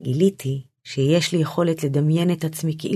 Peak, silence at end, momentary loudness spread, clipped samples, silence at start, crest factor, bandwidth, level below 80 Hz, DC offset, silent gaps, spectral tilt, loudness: -6 dBFS; 0 s; 9 LU; under 0.1%; 0 s; 14 dB; 14 kHz; -66 dBFS; under 0.1%; none; -6.5 dB/octave; -22 LUFS